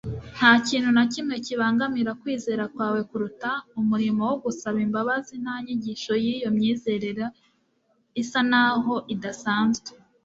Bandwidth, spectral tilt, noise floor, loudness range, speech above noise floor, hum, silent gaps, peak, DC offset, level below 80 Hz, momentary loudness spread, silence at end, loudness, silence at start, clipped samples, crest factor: 7.8 kHz; -4.5 dB/octave; -68 dBFS; 4 LU; 44 dB; none; none; -2 dBFS; under 0.1%; -58 dBFS; 11 LU; 0.3 s; -24 LUFS; 0.05 s; under 0.1%; 22 dB